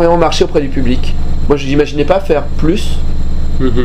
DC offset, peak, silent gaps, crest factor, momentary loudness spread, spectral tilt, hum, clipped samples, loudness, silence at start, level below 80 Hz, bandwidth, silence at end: under 0.1%; 0 dBFS; none; 10 dB; 9 LU; -6.5 dB/octave; none; 0.2%; -14 LUFS; 0 s; -14 dBFS; 9 kHz; 0 s